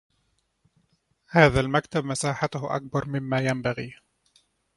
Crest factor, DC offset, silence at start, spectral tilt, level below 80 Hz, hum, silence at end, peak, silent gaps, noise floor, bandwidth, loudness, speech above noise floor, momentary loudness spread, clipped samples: 26 dB; under 0.1%; 1.3 s; -5.5 dB/octave; -48 dBFS; none; 0.85 s; -2 dBFS; none; -72 dBFS; 11.5 kHz; -25 LUFS; 47 dB; 11 LU; under 0.1%